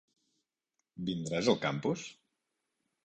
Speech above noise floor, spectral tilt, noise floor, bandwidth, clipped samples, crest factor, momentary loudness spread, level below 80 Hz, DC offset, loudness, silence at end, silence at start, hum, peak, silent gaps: 53 dB; -5 dB/octave; -86 dBFS; 9.8 kHz; under 0.1%; 24 dB; 11 LU; -70 dBFS; under 0.1%; -33 LUFS; 0.9 s; 0.95 s; none; -14 dBFS; none